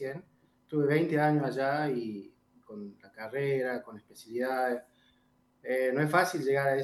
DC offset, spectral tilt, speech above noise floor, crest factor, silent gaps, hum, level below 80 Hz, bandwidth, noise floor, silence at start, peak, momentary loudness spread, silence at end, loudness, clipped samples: under 0.1%; -6.5 dB/octave; 39 dB; 22 dB; none; none; -80 dBFS; 12.5 kHz; -69 dBFS; 0 s; -10 dBFS; 19 LU; 0 s; -30 LUFS; under 0.1%